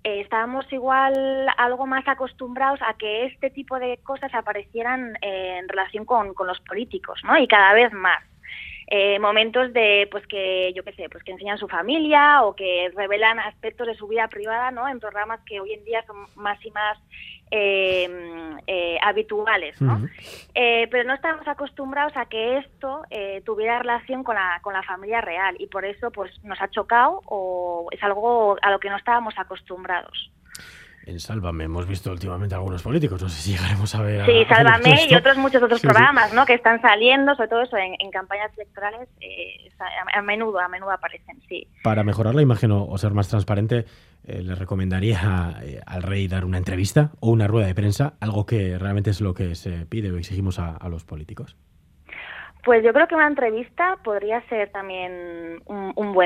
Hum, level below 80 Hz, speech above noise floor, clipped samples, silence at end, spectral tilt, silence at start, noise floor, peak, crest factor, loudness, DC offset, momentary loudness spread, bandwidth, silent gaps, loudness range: none; -50 dBFS; 31 dB; under 0.1%; 0 s; -6 dB/octave; 0.05 s; -52 dBFS; 0 dBFS; 22 dB; -21 LUFS; under 0.1%; 18 LU; 14.5 kHz; none; 11 LU